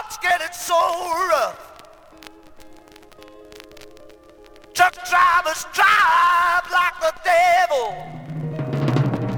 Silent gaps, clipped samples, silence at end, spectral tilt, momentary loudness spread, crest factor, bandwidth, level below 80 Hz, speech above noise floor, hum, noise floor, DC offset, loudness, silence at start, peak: none; under 0.1%; 0 s; -4 dB/octave; 14 LU; 18 dB; over 20 kHz; -54 dBFS; 28 dB; none; -46 dBFS; under 0.1%; -18 LUFS; 0 s; -2 dBFS